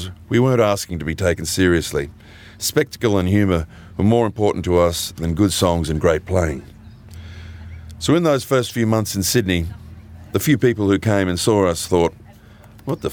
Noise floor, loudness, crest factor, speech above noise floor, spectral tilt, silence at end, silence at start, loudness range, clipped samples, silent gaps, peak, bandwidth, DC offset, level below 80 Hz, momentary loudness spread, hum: -44 dBFS; -19 LUFS; 16 dB; 26 dB; -5.5 dB/octave; 0 s; 0 s; 2 LU; under 0.1%; none; -2 dBFS; over 20 kHz; under 0.1%; -42 dBFS; 15 LU; none